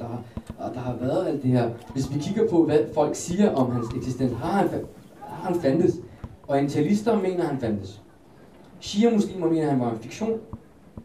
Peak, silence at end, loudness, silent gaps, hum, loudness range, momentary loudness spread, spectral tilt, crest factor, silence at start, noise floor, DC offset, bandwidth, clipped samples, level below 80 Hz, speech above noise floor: -8 dBFS; 0 s; -25 LUFS; none; none; 3 LU; 15 LU; -7 dB/octave; 18 dB; 0 s; -51 dBFS; 0.1%; 14 kHz; under 0.1%; -52 dBFS; 27 dB